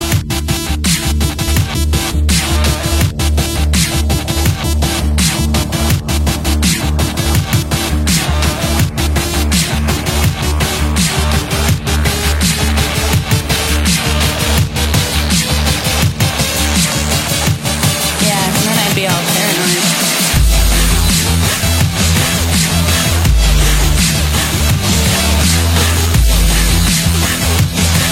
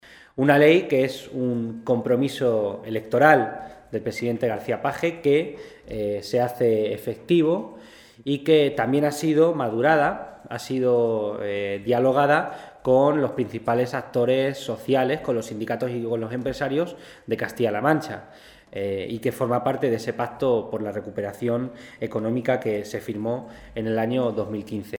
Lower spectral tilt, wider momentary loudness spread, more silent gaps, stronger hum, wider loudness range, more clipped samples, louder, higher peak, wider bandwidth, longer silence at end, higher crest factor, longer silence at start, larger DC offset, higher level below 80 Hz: second, -3.5 dB/octave vs -6.5 dB/octave; second, 3 LU vs 12 LU; neither; neither; second, 2 LU vs 5 LU; neither; first, -13 LUFS vs -23 LUFS; about the same, 0 dBFS vs -2 dBFS; second, 16.5 kHz vs 19 kHz; about the same, 0 s vs 0 s; second, 12 dB vs 22 dB; about the same, 0 s vs 0.1 s; neither; first, -18 dBFS vs -58 dBFS